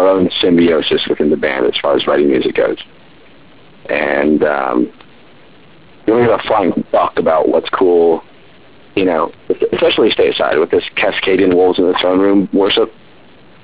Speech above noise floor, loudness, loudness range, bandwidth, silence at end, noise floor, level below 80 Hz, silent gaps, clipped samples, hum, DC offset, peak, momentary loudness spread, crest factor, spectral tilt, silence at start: 31 dB; -13 LUFS; 4 LU; 4 kHz; 0.75 s; -43 dBFS; -46 dBFS; none; under 0.1%; none; 0.8%; 0 dBFS; 7 LU; 12 dB; -9.5 dB/octave; 0 s